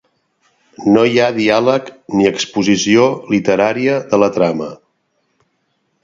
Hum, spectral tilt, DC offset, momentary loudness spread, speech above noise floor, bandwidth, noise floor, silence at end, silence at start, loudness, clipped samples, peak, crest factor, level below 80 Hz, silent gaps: none; -5 dB/octave; under 0.1%; 8 LU; 52 dB; 7.8 kHz; -65 dBFS; 1.3 s; 0.8 s; -14 LUFS; under 0.1%; 0 dBFS; 16 dB; -54 dBFS; none